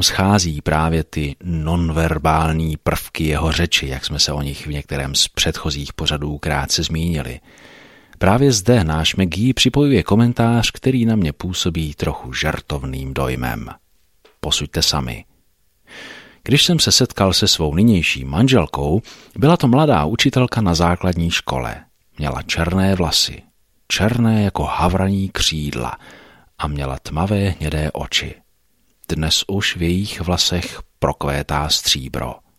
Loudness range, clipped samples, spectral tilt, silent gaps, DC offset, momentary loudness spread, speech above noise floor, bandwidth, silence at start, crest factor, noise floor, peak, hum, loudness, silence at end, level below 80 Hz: 6 LU; under 0.1%; -4.5 dB/octave; none; under 0.1%; 11 LU; 45 dB; 16 kHz; 0 s; 18 dB; -63 dBFS; 0 dBFS; none; -18 LUFS; 0.2 s; -32 dBFS